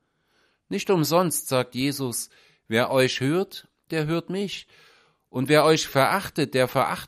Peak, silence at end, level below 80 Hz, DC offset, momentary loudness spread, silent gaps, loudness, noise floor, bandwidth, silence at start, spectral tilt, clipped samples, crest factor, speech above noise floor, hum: -4 dBFS; 0 s; -62 dBFS; under 0.1%; 12 LU; none; -24 LUFS; -67 dBFS; 15.5 kHz; 0.7 s; -4.5 dB/octave; under 0.1%; 22 dB; 44 dB; none